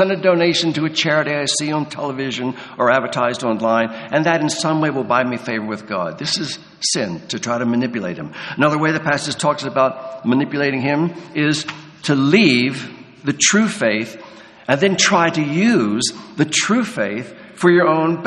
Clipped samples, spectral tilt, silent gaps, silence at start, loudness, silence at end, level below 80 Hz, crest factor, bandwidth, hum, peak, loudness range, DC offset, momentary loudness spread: under 0.1%; -4 dB/octave; none; 0 s; -18 LUFS; 0 s; -60 dBFS; 18 dB; 11 kHz; none; 0 dBFS; 4 LU; under 0.1%; 11 LU